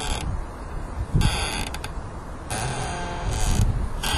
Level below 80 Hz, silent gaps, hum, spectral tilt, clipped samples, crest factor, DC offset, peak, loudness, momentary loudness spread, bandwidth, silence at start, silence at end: -28 dBFS; none; none; -4 dB/octave; under 0.1%; 18 dB; under 0.1%; -6 dBFS; -28 LUFS; 12 LU; 13.5 kHz; 0 s; 0 s